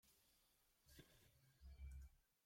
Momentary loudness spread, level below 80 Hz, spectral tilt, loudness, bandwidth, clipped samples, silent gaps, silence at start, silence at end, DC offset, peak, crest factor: 8 LU; -66 dBFS; -4.5 dB/octave; -64 LUFS; 16.5 kHz; under 0.1%; none; 0.05 s; 0.1 s; under 0.1%; -48 dBFS; 16 dB